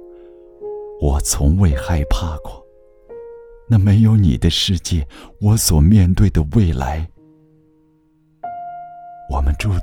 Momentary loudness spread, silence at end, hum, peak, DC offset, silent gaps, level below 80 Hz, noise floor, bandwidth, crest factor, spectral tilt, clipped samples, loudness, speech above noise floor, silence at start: 22 LU; 0 s; none; 0 dBFS; under 0.1%; none; -26 dBFS; -56 dBFS; 19 kHz; 16 dB; -5.5 dB/octave; under 0.1%; -16 LUFS; 41 dB; 0 s